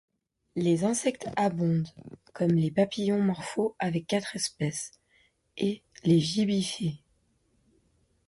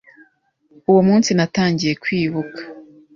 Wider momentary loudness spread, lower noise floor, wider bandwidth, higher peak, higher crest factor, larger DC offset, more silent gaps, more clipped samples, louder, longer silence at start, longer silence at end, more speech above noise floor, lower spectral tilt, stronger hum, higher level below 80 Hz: second, 11 LU vs 17 LU; first, -70 dBFS vs -59 dBFS; first, 11.5 kHz vs 7.4 kHz; second, -12 dBFS vs -4 dBFS; about the same, 18 dB vs 16 dB; neither; neither; neither; second, -28 LUFS vs -17 LUFS; second, 0.55 s vs 0.9 s; first, 1.3 s vs 0.35 s; about the same, 43 dB vs 43 dB; about the same, -5.5 dB/octave vs -5.5 dB/octave; neither; second, -64 dBFS vs -54 dBFS